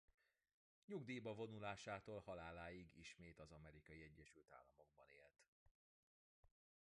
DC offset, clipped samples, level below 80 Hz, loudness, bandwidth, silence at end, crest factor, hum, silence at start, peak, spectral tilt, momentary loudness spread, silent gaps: under 0.1%; under 0.1%; -76 dBFS; -56 LUFS; 10 kHz; 0.5 s; 22 dB; none; 0.9 s; -36 dBFS; -5.5 dB/octave; 16 LU; 5.48-6.43 s